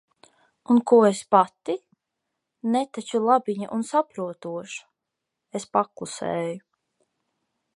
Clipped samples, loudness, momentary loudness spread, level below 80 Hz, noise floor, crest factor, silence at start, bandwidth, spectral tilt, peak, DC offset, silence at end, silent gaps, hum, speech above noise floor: under 0.1%; -24 LUFS; 16 LU; -76 dBFS; -84 dBFS; 22 dB; 0.7 s; 11.5 kHz; -5.5 dB/octave; -4 dBFS; under 0.1%; 1.2 s; none; none; 61 dB